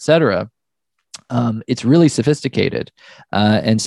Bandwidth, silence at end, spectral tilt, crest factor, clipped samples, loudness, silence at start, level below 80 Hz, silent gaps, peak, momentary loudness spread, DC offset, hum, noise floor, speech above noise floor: 12 kHz; 0 s; -6 dB/octave; 16 dB; under 0.1%; -17 LUFS; 0 s; -54 dBFS; none; 0 dBFS; 11 LU; under 0.1%; none; -76 dBFS; 60 dB